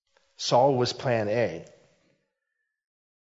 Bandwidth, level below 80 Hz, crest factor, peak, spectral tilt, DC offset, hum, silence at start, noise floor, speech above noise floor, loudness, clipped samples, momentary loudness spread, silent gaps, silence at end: 7.8 kHz; -70 dBFS; 20 dB; -8 dBFS; -5 dB/octave; under 0.1%; none; 0.4 s; -82 dBFS; 57 dB; -25 LUFS; under 0.1%; 10 LU; none; 1.7 s